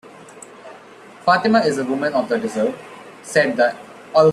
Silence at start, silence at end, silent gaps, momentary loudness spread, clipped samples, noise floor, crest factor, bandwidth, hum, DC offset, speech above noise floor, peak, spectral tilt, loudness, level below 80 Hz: 0.05 s; 0 s; none; 24 LU; under 0.1%; -42 dBFS; 18 dB; 13 kHz; none; under 0.1%; 24 dB; -2 dBFS; -5 dB/octave; -19 LUFS; -62 dBFS